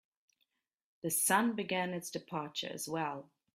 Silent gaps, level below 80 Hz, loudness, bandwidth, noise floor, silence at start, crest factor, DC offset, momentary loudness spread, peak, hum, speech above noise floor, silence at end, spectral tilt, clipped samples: none; -80 dBFS; -35 LUFS; 16 kHz; -82 dBFS; 1.05 s; 24 dB; under 0.1%; 12 LU; -14 dBFS; none; 47 dB; 0.3 s; -3 dB/octave; under 0.1%